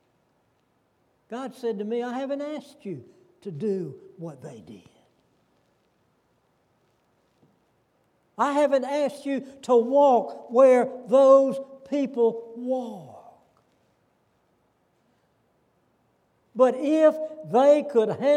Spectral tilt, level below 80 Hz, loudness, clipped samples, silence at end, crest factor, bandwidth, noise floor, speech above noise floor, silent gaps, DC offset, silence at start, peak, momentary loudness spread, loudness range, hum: -6.5 dB/octave; -80 dBFS; -23 LUFS; under 0.1%; 0 s; 20 dB; 10.5 kHz; -69 dBFS; 46 dB; none; under 0.1%; 1.3 s; -6 dBFS; 21 LU; 17 LU; none